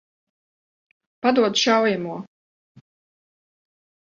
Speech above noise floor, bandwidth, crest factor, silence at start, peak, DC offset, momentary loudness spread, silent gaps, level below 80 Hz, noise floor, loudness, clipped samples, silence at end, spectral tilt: over 70 dB; 7.6 kHz; 22 dB; 1.25 s; -4 dBFS; under 0.1%; 14 LU; none; -72 dBFS; under -90 dBFS; -20 LUFS; under 0.1%; 1.95 s; -3.5 dB/octave